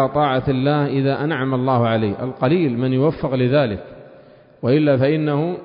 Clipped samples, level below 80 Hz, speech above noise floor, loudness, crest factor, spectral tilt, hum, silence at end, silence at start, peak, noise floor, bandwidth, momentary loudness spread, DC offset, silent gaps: under 0.1%; -48 dBFS; 28 dB; -19 LUFS; 12 dB; -12.5 dB/octave; none; 0 s; 0 s; -6 dBFS; -46 dBFS; 5.2 kHz; 4 LU; under 0.1%; none